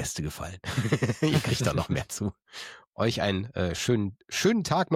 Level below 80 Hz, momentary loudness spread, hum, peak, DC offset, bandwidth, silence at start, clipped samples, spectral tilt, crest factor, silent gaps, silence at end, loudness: -50 dBFS; 11 LU; none; -12 dBFS; under 0.1%; 16.5 kHz; 0 s; under 0.1%; -5 dB/octave; 16 dB; 2.87-2.93 s; 0 s; -28 LUFS